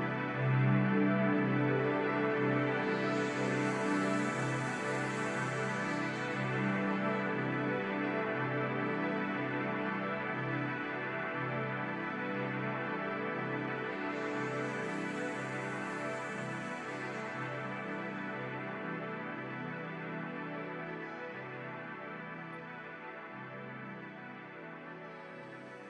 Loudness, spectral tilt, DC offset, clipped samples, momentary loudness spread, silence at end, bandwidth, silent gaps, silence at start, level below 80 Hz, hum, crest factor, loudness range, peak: -36 LUFS; -6.5 dB/octave; under 0.1%; under 0.1%; 13 LU; 0 s; 11 kHz; none; 0 s; -78 dBFS; none; 16 dB; 11 LU; -20 dBFS